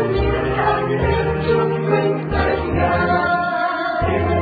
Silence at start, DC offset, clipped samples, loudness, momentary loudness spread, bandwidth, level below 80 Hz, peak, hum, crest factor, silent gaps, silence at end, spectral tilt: 0 s; under 0.1%; under 0.1%; -18 LUFS; 3 LU; 4.9 kHz; -30 dBFS; -4 dBFS; none; 14 dB; none; 0 s; -9.5 dB/octave